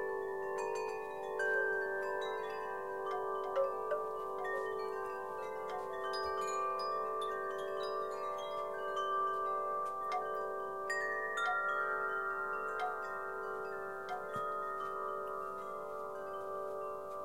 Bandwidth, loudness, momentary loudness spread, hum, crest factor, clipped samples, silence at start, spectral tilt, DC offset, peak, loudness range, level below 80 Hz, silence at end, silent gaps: 16.5 kHz; -38 LUFS; 7 LU; none; 16 dB; under 0.1%; 0 s; -3.5 dB/octave; 0.1%; -24 dBFS; 4 LU; -76 dBFS; 0 s; none